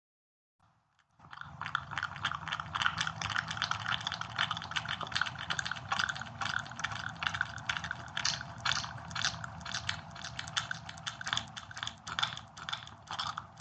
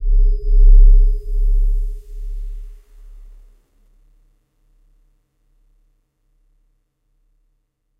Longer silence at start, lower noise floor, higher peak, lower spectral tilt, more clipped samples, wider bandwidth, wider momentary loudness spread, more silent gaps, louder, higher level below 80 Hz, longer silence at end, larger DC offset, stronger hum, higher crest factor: first, 1.2 s vs 0 s; first, -72 dBFS vs -67 dBFS; second, -10 dBFS vs -2 dBFS; second, -1.5 dB/octave vs -9.5 dB/octave; neither; first, 9 kHz vs 0.5 kHz; second, 8 LU vs 21 LU; neither; second, -36 LUFS vs -18 LUFS; second, -64 dBFS vs -16 dBFS; second, 0 s vs 5.25 s; neither; neither; first, 28 dB vs 16 dB